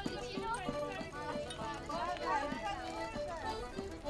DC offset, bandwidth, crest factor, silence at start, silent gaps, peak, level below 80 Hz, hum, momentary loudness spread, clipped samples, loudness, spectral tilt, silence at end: under 0.1%; 12 kHz; 16 dB; 0 s; none; -24 dBFS; -54 dBFS; none; 6 LU; under 0.1%; -40 LUFS; -4.5 dB/octave; 0 s